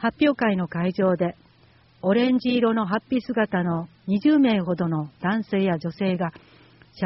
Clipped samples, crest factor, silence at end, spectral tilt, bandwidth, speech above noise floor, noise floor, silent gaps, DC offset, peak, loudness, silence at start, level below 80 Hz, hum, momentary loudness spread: under 0.1%; 16 dB; 0 s; -5.5 dB/octave; 5.8 kHz; 34 dB; -56 dBFS; none; under 0.1%; -8 dBFS; -23 LUFS; 0 s; -60 dBFS; none; 7 LU